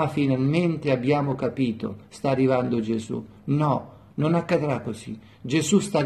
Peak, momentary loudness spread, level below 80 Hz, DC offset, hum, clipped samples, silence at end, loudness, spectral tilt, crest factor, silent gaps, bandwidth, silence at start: -8 dBFS; 12 LU; -58 dBFS; under 0.1%; none; under 0.1%; 0 s; -24 LUFS; -6.5 dB/octave; 16 dB; none; 13 kHz; 0 s